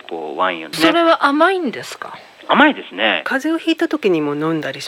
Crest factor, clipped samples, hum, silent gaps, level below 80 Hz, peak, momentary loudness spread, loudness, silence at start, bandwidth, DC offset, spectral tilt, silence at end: 18 dB; under 0.1%; none; none; -64 dBFS; 0 dBFS; 15 LU; -16 LUFS; 0.1 s; 15.5 kHz; under 0.1%; -4.5 dB/octave; 0 s